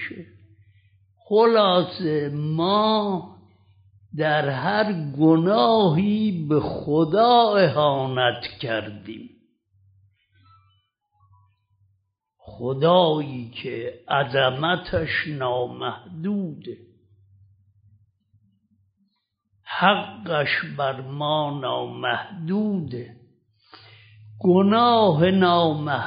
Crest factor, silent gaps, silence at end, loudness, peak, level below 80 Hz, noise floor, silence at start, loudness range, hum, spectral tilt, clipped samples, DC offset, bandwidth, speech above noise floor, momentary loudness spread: 20 dB; none; 0 s; -21 LUFS; -4 dBFS; -58 dBFS; -72 dBFS; 0 s; 11 LU; none; -4 dB/octave; under 0.1%; under 0.1%; 5.2 kHz; 51 dB; 15 LU